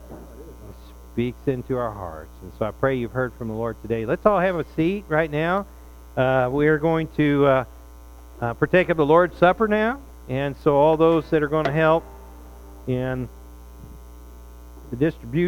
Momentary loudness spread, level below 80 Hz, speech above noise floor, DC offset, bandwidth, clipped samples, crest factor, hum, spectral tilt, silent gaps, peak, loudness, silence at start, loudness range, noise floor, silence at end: 18 LU; -42 dBFS; 22 dB; under 0.1%; 18 kHz; under 0.1%; 20 dB; none; -8 dB/octave; none; -2 dBFS; -22 LUFS; 0 s; 8 LU; -43 dBFS; 0 s